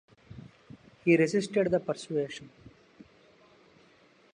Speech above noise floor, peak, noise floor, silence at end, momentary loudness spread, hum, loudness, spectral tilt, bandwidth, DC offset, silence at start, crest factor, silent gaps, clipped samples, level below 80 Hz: 34 dB; -12 dBFS; -61 dBFS; 1.85 s; 25 LU; none; -28 LUFS; -6 dB/octave; 10 kHz; under 0.1%; 0.3 s; 20 dB; none; under 0.1%; -68 dBFS